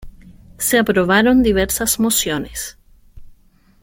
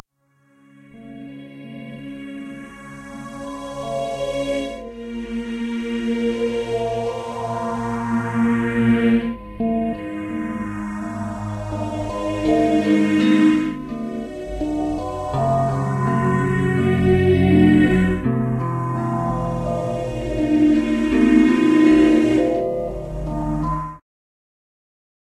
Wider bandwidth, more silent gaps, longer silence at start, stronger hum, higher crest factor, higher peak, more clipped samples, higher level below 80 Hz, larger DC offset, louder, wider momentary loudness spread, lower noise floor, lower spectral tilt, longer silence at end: first, 17 kHz vs 11 kHz; neither; second, 0 s vs 0.95 s; neither; about the same, 16 dB vs 18 dB; about the same, -2 dBFS vs -2 dBFS; neither; about the same, -38 dBFS vs -38 dBFS; neither; first, -16 LUFS vs -20 LUFS; second, 13 LU vs 18 LU; second, -51 dBFS vs -62 dBFS; second, -3.5 dB/octave vs -7.5 dB/octave; second, 0.5 s vs 1.25 s